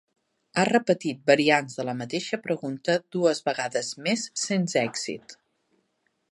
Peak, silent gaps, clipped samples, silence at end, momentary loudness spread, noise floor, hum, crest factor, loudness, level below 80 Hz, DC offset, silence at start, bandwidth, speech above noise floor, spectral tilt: -4 dBFS; none; under 0.1%; 1 s; 10 LU; -74 dBFS; none; 22 dB; -25 LUFS; -76 dBFS; under 0.1%; 0.55 s; 11.5 kHz; 48 dB; -4 dB/octave